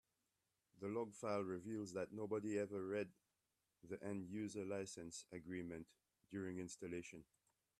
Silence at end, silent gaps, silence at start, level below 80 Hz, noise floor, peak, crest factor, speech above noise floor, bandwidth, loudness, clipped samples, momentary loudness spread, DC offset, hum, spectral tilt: 0.55 s; none; 0.75 s; -82 dBFS; -89 dBFS; -30 dBFS; 18 dB; 42 dB; 13.5 kHz; -48 LUFS; under 0.1%; 9 LU; under 0.1%; none; -5.5 dB/octave